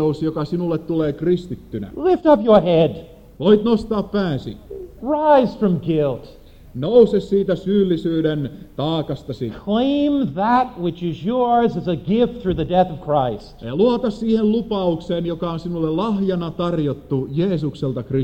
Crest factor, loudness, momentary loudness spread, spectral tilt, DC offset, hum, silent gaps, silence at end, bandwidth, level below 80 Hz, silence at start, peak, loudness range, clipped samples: 18 dB; -19 LUFS; 12 LU; -8.5 dB/octave; under 0.1%; none; none; 0 s; 8.6 kHz; -44 dBFS; 0 s; -2 dBFS; 3 LU; under 0.1%